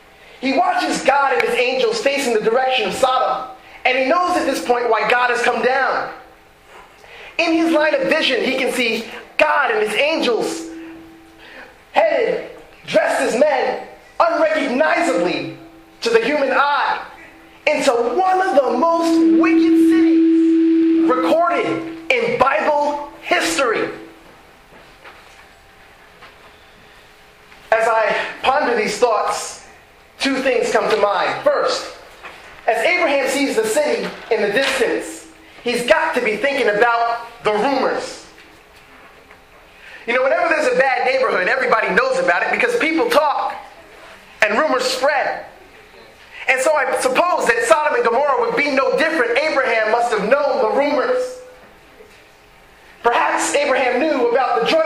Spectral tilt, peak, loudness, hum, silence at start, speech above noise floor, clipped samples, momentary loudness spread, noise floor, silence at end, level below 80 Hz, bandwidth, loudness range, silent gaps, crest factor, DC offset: -3 dB/octave; 0 dBFS; -17 LUFS; none; 0.4 s; 30 dB; under 0.1%; 10 LU; -47 dBFS; 0 s; -56 dBFS; 15.5 kHz; 5 LU; none; 18 dB; under 0.1%